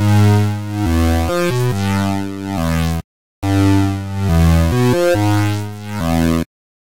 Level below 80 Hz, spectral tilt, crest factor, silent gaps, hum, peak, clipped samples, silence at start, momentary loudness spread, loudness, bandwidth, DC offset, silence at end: -28 dBFS; -6.5 dB/octave; 12 dB; 3.04-3.42 s; none; -2 dBFS; under 0.1%; 0 s; 9 LU; -16 LUFS; 17 kHz; 3%; 0.4 s